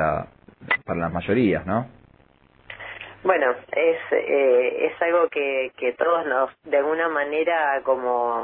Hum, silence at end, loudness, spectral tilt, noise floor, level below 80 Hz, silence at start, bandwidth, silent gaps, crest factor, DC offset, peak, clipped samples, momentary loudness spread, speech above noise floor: none; 0 s; -22 LUFS; -10 dB/octave; -56 dBFS; -54 dBFS; 0 s; 4.1 kHz; none; 18 dB; under 0.1%; -6 dBFS; under 0.1%; 9 LU; 35 dB